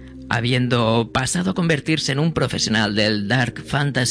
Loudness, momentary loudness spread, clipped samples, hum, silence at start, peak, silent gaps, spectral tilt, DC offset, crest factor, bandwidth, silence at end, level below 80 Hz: -20 LUFS; 3 LU; under 0.1%; none; 0 s; -4 dBFS; none; -4.5 dB/octave; under 0.1%; 16 dB; 11 kHz; 0 s; -46 dBFS